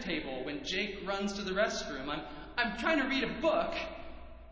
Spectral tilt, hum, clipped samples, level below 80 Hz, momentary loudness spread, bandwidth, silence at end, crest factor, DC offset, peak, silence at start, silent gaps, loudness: -4 dB/octave; none; under 0.1%; -54 dBFS; 10 LU; 8 kHz; 0 s; 20 dB; under 0.1%; -14 dBFS; 0 s; none; -34 LUFS